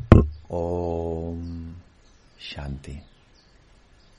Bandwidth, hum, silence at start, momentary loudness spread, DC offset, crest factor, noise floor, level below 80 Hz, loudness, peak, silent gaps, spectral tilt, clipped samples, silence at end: 7.6 kHz; none; 0 s; 22 LU; under 0.1%; 24 dB; -55 dBFS; -32 dBFS; -26 LUFS; 0 dBFS; none; -9 dB/octave; under 0.1%; 1.2 s